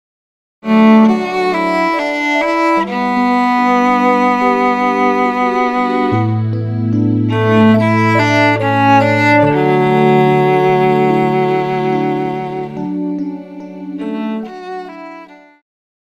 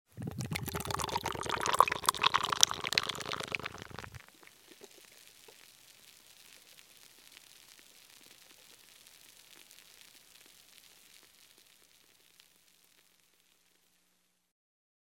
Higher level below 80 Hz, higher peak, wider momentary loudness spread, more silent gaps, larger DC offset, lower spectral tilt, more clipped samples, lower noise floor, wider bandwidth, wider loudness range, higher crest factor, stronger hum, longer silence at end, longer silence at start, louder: first, -52 dBFS vs -64 dBFS; about the same, 0 dBFS vs 0 dBFS; second, 13 LU vs 28 LU; neither; neither; first, -7.5 dB/octave vs -1.5 dB/octave; neither; second, -36 dBFS vs -75 dBFS; second, 12 kHz vs 17.5 kHz; second, 9 LU vs 25 LU; second, 14 dB vs 40 dB; neither; second, 0.8 s vs 4.85 s; first, 0.65 s vs 0.15 s; first, -13 LUFS vs -32 LUFS